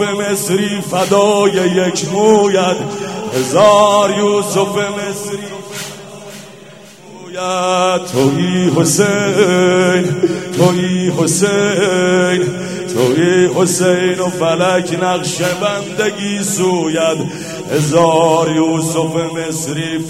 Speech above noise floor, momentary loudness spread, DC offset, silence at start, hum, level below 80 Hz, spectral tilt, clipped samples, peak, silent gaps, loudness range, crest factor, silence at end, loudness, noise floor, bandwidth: 24 dB; 11 LU; 0.2%; 0 s; none; -54 dBFS; -4.5 dB/octave; under 0.1%; 0 dBFS; none; 5 LU; 14 dB; 0 s; -13 LUFS; -37 dBFS; 16 kHz